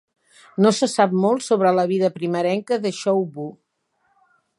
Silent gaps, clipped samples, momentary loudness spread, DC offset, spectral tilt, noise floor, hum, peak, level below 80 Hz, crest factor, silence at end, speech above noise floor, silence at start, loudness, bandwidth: none; under 0.1%; 11 LU; under 0.1%; -5.5 dB/octave; -69 dBFS; none; -2 dBFS; -74 dBFS; 18 dB; 1.05 s; 49 dB; 0.6 s; -20 LUFS; 11.5 kHz